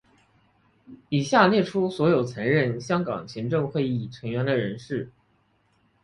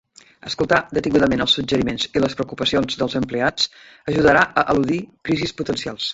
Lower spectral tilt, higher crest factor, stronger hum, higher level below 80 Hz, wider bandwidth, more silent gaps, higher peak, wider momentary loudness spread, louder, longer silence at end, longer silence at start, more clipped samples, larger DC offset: first, -6.5 dB/octave vs -4.5 dB/octave; about the same, 20 dB vs 20 dB; neither; second, -60 dBFS vs -44 dBFS; first, 11 kHz vs 8 kHz; neither; second, -6 dBFS vs 0 dBFS; first, 12 LU vs 9 LU; second, -24 LUFS vs -20 LUFS; first, 0.95 s vs 0 s; first, 0.9 s vs 0.45 s; neither; neither